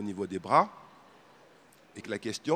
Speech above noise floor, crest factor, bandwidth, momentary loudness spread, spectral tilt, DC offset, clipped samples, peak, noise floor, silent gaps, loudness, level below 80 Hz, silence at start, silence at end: 29 dB; 24 dB; 19 kHz; 19 LU; -5 dB/octave; under 0.1%; under 0.1%; -8 dBFS; -59 dBFS; none; -30 LUFS; -76 dBFS; 0 s; 0 s